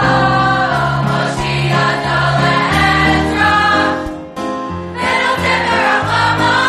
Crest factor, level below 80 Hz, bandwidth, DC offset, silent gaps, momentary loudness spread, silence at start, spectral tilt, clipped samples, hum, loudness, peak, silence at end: 12 dB; -34 dBFS; 13 kHz; under 0.1%; none; 10 LU; 0 s; -5 dB/octave; under 0.1%; none; -13 LUFS; 0 dBFS; 0 s